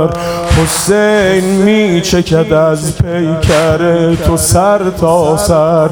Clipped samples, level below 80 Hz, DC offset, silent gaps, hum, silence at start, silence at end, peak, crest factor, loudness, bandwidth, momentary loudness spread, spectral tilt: under 0.1%; -26 dBFS; under 0.1%; none; none; 0 s; 0 s; 0 dBFS; 10 dB; -10 LUFS; 18 kHz; 4 LU; -5 dB/octave